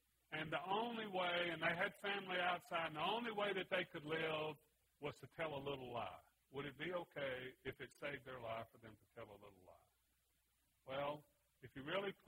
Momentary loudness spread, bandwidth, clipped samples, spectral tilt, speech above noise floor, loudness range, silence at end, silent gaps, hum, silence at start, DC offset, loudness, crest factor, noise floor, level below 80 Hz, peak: 18 LU; 16 kHz; under 0.1%; -5 dB/octave; 37 dB; 12 LU; 0.15 s; none; none; 0.3 s; under 0.1%; -45 LUFS; 22 dB; -82 dBFS; -78 dBFS; -24 dBFS